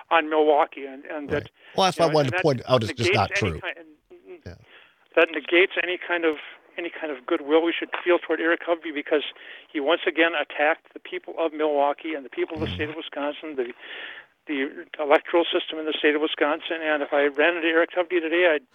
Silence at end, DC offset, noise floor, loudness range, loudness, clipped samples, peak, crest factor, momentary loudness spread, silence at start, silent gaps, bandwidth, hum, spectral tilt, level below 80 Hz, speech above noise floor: 0.15 s; under 0.1%; -54 dBFS; 5 LU; -24 LUFS; under 0.1%; -4 dBFS; 20 dB; 14 LU; 0.1 s; none; 13 kHz; none; -5 dB/octave; -62 dBFS; 30 dB